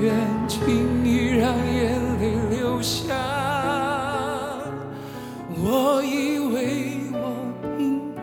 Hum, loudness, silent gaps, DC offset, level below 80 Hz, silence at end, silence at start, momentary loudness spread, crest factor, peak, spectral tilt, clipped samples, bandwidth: none; -24 LUFS; none; under 0.1%; -42 dBFS; 0 s; 0 s; 10 LU; 16 dB; -8 dBFS; -5.5 dB/octave; under 0.1%; 19 kHz